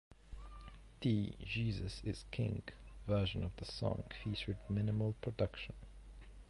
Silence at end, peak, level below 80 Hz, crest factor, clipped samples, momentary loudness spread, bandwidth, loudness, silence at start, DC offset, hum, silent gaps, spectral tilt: 0 s; -24 dBFS; -52 dBFS; 18 dB; under 0.1%; 19 LU; 11.5 kHz; -40 LUFS; 0.1 s; under 0.1%; none; none; -7 dB/octave